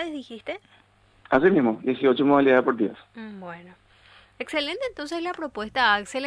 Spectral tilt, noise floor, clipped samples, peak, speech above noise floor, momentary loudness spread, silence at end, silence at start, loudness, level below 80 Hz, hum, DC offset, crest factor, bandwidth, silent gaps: -5.5 dB/octave; -54 dBFS; under 0.1%; -4 dBFS; 30 dB; 20 LU; 0 s; 0 s; -23 LUFS; -60 dBFS; none; under 0.1%; 20 dB; 11 kHz; none